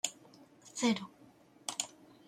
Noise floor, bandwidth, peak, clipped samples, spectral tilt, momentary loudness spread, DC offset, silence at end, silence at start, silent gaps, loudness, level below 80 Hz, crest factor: -61 dBFS; 16 kHz; -16 dBFS; under 0.1%; -2.5 dB/octave; 22 LU; under 0.1%; 0.4 s; 0.05 s; none; -37 LUFS; -80 dBFS; 24 dB